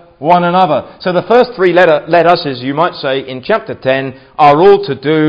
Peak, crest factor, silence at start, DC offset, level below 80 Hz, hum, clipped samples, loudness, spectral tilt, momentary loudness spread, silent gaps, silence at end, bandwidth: 0 dBFS; 10 dB; 0.2 s; under 0.1%; -50 dBFS; none; 0.7%; -11 LUFS; -7.5 dB/octave; 9 LU; none; 0 s; 8 kHz